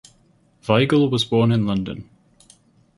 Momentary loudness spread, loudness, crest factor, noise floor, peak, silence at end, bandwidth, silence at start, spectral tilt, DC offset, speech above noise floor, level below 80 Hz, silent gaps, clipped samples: 16 LU; -19 LUFS; 20 dB; -58 dBFS; -2 dBFS; 0.95 s; 11.5 kHz; 0.65 s; -7 dB/octave; under 0.1%; 40 dB; -52 dBFS; none; under 0.1%